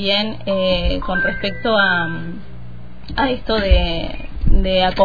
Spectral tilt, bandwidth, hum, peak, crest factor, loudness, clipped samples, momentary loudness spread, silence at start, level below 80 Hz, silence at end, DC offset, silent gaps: -7 dB/octave; 5 kHz; none; -2 dBFS; 16 dB; -19 LUFS; under 0.1%; 17 LU; 0 s; -22 dBFS; 0 s; 4%; none